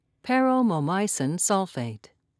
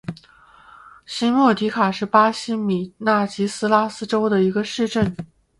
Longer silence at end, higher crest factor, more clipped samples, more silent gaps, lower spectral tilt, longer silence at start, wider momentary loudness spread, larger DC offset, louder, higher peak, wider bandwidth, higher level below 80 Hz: about the same, 0.4 s vs 0.35 s; about the same, 16 dB vs 20 dB; neither; neither; about the same, -4.5 dB/octave vs -5.5 dB/octave; first, 0.25 s vs 0.1 s; first, 10 LU vs 7 LU; neither; second, -24 LUFS vs -20 LUFS; second, -10 dBFS vs -2 dBFS; about the same, 11 kHz vs 11.5 kHz; second, -76 dBFS vs -54 dBFS